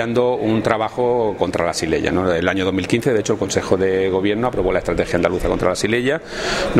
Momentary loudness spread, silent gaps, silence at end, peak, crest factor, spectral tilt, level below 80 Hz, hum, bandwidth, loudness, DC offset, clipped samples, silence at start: 2 LU; none; 0 s; 0 dBFS; 18 dB; -5 dB/octave; -38 dBFS; none; 14.5 kHz; -19 LUFS; under 0.1%; under 0.1%; 0 s